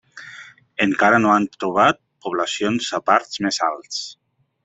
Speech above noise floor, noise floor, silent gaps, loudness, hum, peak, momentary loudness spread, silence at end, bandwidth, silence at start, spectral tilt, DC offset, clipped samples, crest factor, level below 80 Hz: 23 dB; -42 dBFS; none; -19 LUFS; none; -2 dBFS; 20 LU; 0.5 s; 8.4 kHz; 0.15 s; -4 dB/octave; under 0.1%; under 0.1%; 20 dB; -62 dBFS